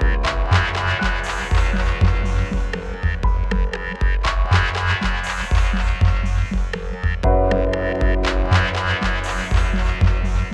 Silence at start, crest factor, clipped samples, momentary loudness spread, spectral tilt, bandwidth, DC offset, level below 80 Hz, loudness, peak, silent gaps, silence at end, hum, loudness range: 0 s; 14 dB; under 0.1%; 6 LU; -5.5 dB/octave; 9.6 kHz; under 0.1%; -20 dBFS; -20 LUFS; -4 dBFS; none; 0 s; none; 2 LU